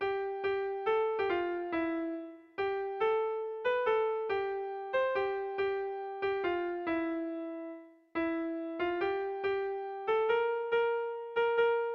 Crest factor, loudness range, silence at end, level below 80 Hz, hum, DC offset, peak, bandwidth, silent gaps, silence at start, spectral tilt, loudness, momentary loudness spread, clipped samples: 14 dB; 3 LU; 0 s; -70 dBFS; none; under 0.1%; -18 dBFS; 5.6 kHz; none; 0 s; -6.5 dB/octave; -33 LUFS; 8 LU; under 0.1%